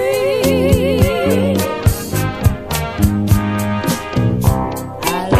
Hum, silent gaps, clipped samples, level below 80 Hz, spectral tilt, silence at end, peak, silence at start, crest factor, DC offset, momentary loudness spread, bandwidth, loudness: none; none; under 0.1%; -26 dBFS; -6 dB/octave; 0 s; 0 dBFS; 0 s; 14 dB; under 0.1%; 6 LU; 15.5 kHz; -16 LUFS